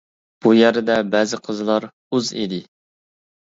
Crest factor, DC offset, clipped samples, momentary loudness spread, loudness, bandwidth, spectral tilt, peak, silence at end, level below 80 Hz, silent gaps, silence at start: 18 dB; under 0.1%; under 0.1%; 11 LU; -19 LUFS; 7.8 kHz; -5 dB/octave; -2 dBFS; 0.9 s; -64 dBFS; 1.93-2.11 s; 0.45 s